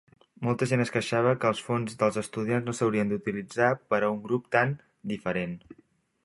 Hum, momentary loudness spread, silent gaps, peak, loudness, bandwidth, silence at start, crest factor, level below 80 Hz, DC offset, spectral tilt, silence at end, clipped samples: none; 8 LU; none; -6 dBFS; -28 LUFS; 11.5 kHz; 0.4 s; 22 dB; -64 dBFS; under 0.1%; -6 dB/octave; 0.5 s; under 0.1%